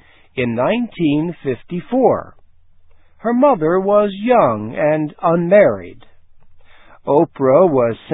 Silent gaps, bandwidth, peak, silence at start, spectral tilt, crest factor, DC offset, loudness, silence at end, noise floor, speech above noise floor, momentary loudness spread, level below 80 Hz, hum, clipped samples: none; 4 kHz; 0 dBFS; 0.35 s; -11.5 dB/octave; 16 dB; under 0.1%; -16 LUFS; 0 s; -45 dBFS; 30 dB; 11 LU; -52 dBFS; none; under 0.1%